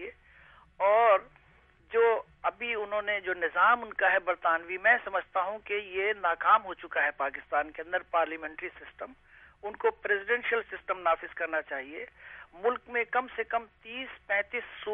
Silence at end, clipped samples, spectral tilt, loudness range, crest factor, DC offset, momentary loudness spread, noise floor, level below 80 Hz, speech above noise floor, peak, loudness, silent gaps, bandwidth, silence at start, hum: 0 s; under 0.1%; -6 dB/octave; 6 LU; 20 dB; under 0.1%; 16 LU; -62 dBFS; -66 dBFS; 31 dB; -12 dBFS; -29 LUFS; none; 3.8 kHz; 0 s; none